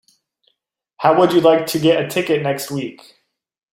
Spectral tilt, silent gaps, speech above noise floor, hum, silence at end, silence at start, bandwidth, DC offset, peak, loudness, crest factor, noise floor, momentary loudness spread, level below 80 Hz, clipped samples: -5 dB/octave; none; 57 dB; none; 0.8 s; 1 s; 16.5 kHz; under 0.1%; -2 dBFS; -16 LUFS; 16 dB; -72 dBFS; 12 LU; -60 dBFS; under 0.1%